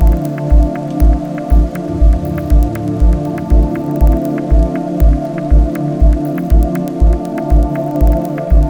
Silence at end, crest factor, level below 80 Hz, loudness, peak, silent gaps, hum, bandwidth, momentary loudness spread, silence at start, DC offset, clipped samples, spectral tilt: 0 s; 10 dB; -12 dBFS; -14 LUFS; 0 dBFS; none; none; 3.4 kHz; 4 LU; 0 s; under 0.1%; under 0.1%; -9 dB/octave